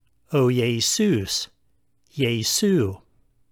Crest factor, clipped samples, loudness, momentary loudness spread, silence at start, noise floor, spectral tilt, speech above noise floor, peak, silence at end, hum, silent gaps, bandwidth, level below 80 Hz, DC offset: 16 dB; under 0.1%; -22 LUFS; 12 LU; 0.3 s; -70 dBFS; -4.5 dB/octave; 48 dB; -8 dBFS; 0.55 s; none; none; over 20 kHz; -58 dBFS; under 0.1%